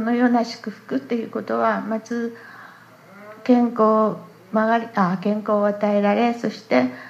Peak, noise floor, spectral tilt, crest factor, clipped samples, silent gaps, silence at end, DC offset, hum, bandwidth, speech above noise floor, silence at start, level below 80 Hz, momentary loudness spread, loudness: -4 dBFS; -46 dBFS; -7 dB/octave; 18 dB; under 0.1%; none; 0 s; under 0.1%; none; 7.8 kHz; 26 dB; 0 s; -76 dBFS; 11 LU; -21 LUFS